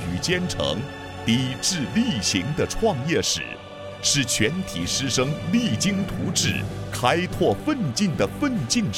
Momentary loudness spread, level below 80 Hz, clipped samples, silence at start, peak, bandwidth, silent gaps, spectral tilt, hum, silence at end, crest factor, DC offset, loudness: 6 LU; -44 dBFS; under 0.1%; 0 s; -4 dBFS; 17 kHz; none; -4 dB/octave; none; 0 s; 20 dB; under 0.1%; -23 LUFS